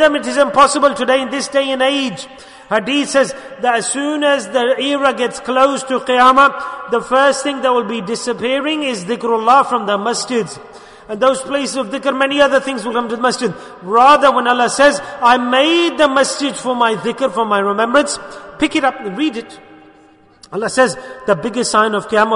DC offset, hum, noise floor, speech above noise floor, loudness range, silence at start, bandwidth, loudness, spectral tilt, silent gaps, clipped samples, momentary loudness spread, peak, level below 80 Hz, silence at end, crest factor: under 0.1%; none; -47 dBFS; 32 dB; 5 LU; 0 s; 11 kHz; -14 LUFS; -3 dB/octave; none; under 0.1%; 9 LU; 0 dBFS; -52 dBFS; 0 s; 14 dB